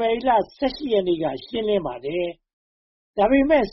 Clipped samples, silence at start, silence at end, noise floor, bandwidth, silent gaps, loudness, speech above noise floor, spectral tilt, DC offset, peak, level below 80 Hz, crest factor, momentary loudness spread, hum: under 0.1%; 0 s; 0 s; under -90 dBFS; 5.8 kHz; 2.53-3.14 s; -22 LUFS; over 69 dB; -3.5 dB/octave; under 0.1%; -6 dBFS; -48 dBFS; 16 dB; 10 LU; none